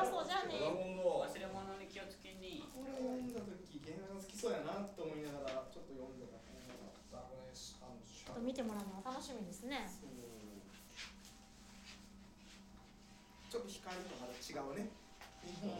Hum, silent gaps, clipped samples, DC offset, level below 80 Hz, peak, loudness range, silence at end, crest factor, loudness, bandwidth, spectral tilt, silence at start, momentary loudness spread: none; none; under 0.1%; under 0.1%; -66 dBFS; -24 dBFS; 9 LU; 0 s; 22 dB; -46 LUFS; 16.5 kHz; -4.5 dB/octave; 0 s; 18 LU